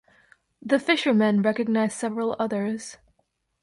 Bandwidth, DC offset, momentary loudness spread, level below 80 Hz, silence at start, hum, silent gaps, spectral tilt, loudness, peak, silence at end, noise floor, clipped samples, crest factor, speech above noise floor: 11.5 kHz; under 0.1%; 12 LU; -68 dBFS; 0.65 s; none; none; -5 dB/octave; -24 LUFS; -8 dBFS; 0.65 s; -73 dBFS; under 0.1%; 18 dB; 49 dB